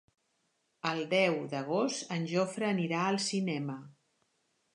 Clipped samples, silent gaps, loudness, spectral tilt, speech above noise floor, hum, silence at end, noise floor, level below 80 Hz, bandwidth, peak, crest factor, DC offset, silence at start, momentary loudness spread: under 0.1%; none; -32 LUFS; -4.5 dB/octave; 46 dB; none; 0.85 s; -77 dBFS; -84 dBFS; 11 kHz; -14 dBFS; 20 dB; under 0.1%; 0.85 s; 8 LU